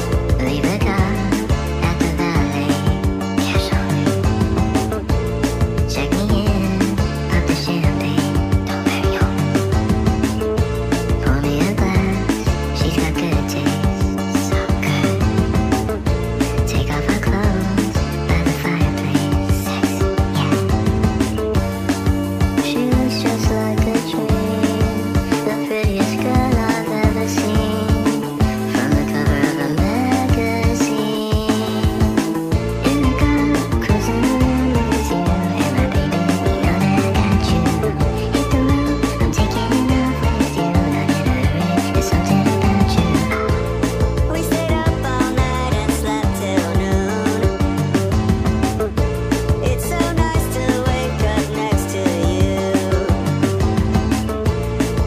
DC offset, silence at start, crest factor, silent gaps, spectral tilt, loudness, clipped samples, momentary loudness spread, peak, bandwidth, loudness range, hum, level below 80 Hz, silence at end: under 0.1%; 0 s; 16 dB; none; -6 dB/octave; -18 LUFS; under 0.1%; 3 LU; 0 dBFS; 16 kHz; 1 LU; none; -24 dBFS; 0 s